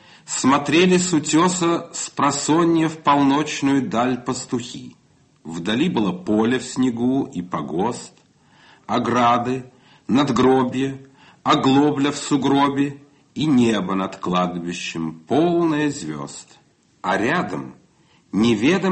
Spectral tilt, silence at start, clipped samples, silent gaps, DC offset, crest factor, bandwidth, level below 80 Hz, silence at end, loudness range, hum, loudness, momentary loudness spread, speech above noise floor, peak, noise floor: -5 dB/octave; 0.3 s; under 0.1%; none; under 0.1%; 16 dB; 8.8 kHz; -56 dBFS; 0 s; 5 LU; none; -20 LUFS; 12 LU; 37 dB; -4 dBFS; -56 dBFS